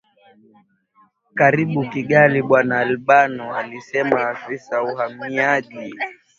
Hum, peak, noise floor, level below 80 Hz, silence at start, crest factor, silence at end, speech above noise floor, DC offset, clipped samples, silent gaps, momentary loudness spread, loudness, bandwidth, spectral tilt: none; 0 dBFS; -53 dBFS; -62 dBFS; 1.35 s; 20 dB; 0.25 s; 34 dB; under 0.1%; under 0.1%; none; 14 LU; -18 LUFS; 7.4 kHz; -7 dB/octave